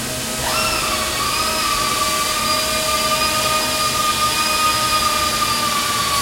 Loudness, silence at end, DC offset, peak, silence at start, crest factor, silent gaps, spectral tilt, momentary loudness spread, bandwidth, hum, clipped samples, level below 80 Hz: -17 LUFS; 0 s; under 0.1%; -6 dBFS; 0 s; 14 dB; none; -1 dB/octave; 3 LU; 16.5 kHz; none; under 0.1%; -40 dBFS